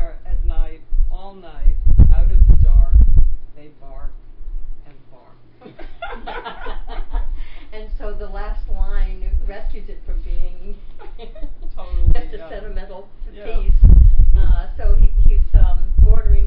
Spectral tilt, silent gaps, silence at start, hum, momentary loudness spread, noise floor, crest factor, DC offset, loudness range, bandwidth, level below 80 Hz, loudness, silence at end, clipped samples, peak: -11.5 dB/octave; none; 0 s; none; 23 LU; -42 dBFS; 12 dB; under 0.1%; 16 LU; 3.7 kHz; -14 dBFS; -19 LUFS; 0 s; 0.5%; 0 dBFS